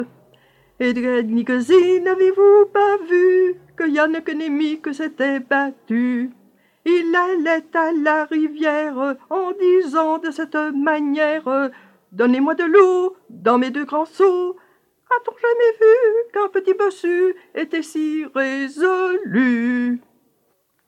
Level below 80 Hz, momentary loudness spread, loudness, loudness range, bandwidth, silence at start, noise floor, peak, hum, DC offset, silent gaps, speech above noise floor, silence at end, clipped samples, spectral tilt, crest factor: -72 dBFS; 10 LU; -18 LUFS; 5 LU; 9.8 kHz; 0 s; -65 dBFS; -2 dBFS; none; under 0.1%; none; 48 dB; 0.9 s; under 0.1%; -5.5 dB/octave; 18 dB